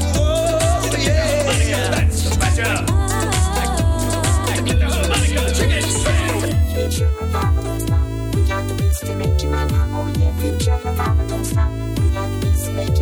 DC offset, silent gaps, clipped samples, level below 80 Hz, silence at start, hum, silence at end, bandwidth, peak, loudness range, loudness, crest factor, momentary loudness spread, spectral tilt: under 0.1%; none; under 0.1%; -22 dBFS; 0 s; none; 0 s; 19.5 kHz; -6 dBFS; 2 LU; -18 LUFS; 12 dB; 3 LU; -5 dB/octave